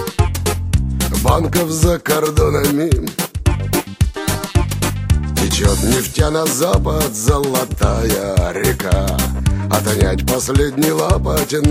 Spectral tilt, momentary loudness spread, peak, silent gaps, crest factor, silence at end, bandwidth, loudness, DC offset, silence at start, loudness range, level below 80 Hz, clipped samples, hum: -5 dB/octave; 4 LU; 0 dBFS; none; 16 dB; 0 s; 16.5 kHz; -16 LUFS; under 0.1%; 0 s; 1 LU; -22 dBFS; under 0.1%; none